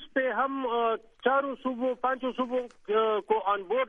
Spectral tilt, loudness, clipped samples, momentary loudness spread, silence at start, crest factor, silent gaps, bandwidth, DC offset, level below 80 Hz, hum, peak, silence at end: -6 dB/octave; -29 LUFS; under 0.1%; 4 LU; 0 s; 16 dB; none; 6 kHz; under 0.1%; -66 dBFS; none; -12 dBFS; 0 s